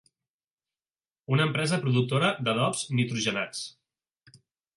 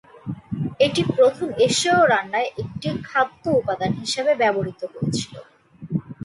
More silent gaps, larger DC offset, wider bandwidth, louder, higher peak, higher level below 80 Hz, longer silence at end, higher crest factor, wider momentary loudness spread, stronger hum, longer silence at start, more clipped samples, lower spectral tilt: neither; neither; about the same, 11.5 kHz vs 11.5 kHz; second, -27 LUFS vs -21 LUFS; second, -12 dBFS vs -6 dBFS; second, -70 dBFS vs -54 dBFS; first, 1.05 s vs 0.1 s; about the same, 18 dB vs 16 dB; about the same, 10 LU vs 12 LU; neither; first, 1.3 s vs 0.25 s; neither; about the same, -5 dB/octave vs -4.5 dB/octave